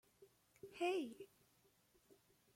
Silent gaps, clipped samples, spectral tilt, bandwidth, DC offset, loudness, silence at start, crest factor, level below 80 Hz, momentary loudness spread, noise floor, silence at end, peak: none; under 0.1%; -4 dB/octave; 16.5 kHz; under 0.1%; -44 LUFS; 0.2 s; 20 dB; -88 dBFS; 20 LU; -76 dBFS; 0.45 s; -30 dBFS